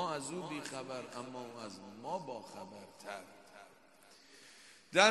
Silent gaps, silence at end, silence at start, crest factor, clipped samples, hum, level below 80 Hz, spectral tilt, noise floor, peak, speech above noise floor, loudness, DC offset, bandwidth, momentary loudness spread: none; 0 s; 0 s; 30 dB; under 0.1%; none; -84 dBFS; -2.5 dB/octave; -63 dBFS; -10 dBFS; 18 dB; -41 LUFS; under 0.1%; 12 kHz; 18 LU